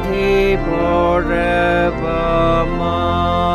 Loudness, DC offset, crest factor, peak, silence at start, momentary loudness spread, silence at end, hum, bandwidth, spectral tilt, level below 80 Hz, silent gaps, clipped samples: -16 LUFS; under 0.1%; 12 dB; -4 dBFS; 0 s; 3 LU; 0 s; none; 14 kHz; -7 dB/octave; -26 dBFS; none; under 0.1%